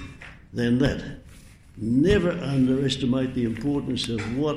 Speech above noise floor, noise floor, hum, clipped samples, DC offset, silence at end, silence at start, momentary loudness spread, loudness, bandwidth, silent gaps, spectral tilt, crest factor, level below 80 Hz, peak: 24 dB; -48 dBFS; none; under 0.1%; under 0.1%; 0 s; 0 s; 16 LU; -24 LUFS; 11.5 kHz; none; -6.5 dB/octave; 18 dB; -42 dBFS; -6 dBFS